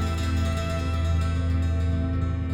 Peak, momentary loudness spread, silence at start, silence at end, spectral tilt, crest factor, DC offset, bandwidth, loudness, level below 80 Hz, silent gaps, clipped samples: -14 dBFS; 2 LU; 0 s; 0 s; -7 dB/octave; 10 dB; under 0.1%; 11 kHz; -26 LUFS; -30 dBFS; none; under 0.1%